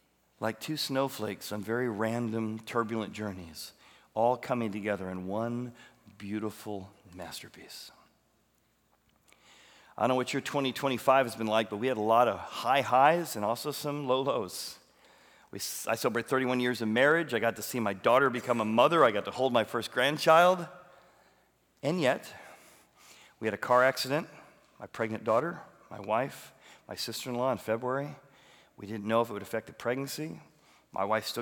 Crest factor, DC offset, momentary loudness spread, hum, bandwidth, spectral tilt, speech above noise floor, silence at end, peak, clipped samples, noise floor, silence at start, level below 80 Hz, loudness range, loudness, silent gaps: 24 dB; under 0.1%; 19 LU; none; over 20 kHz; -4.5 dB/octave; 41 dB; 0 s; -8 dBFS; under 0.1%; -71 dBFS; 0.4 s; -76 dBFS; 10 LU; -30 LUFS; none